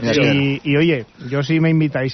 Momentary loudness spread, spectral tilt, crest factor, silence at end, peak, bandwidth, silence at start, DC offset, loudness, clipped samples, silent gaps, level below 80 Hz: 8 LU; -5.5 dB/octave; 12 dB; 0 s; -4 dBFS; 6.4 kHz; 0 s; under 0.1%; -17 LUFS; under 0.1%; none; -50 dBFS